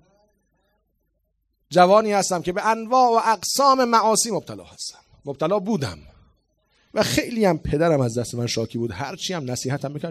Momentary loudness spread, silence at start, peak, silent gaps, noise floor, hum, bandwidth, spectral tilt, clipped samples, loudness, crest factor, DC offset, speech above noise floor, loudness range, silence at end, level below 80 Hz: 14 LU; 1.7 s; -2 dBFS; none; -71 dBFS; none; 15.5 kHz; -4.5 dB/octave; under 0.1%; -21 LUFS; 20 dB; under 0.1%; 51 dB; 7 LU; 0 s; -50 dBFS